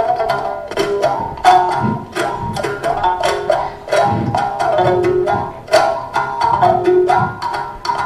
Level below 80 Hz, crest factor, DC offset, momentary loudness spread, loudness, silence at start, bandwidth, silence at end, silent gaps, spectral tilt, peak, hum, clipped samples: -42 dBFS; 16 dB; under 0.1%; 8 LU; -16 LUFS; 0 s; 14 kHz; 0 s; none; -5.5 dB/octave; 0 dBFS; none; under 0.1%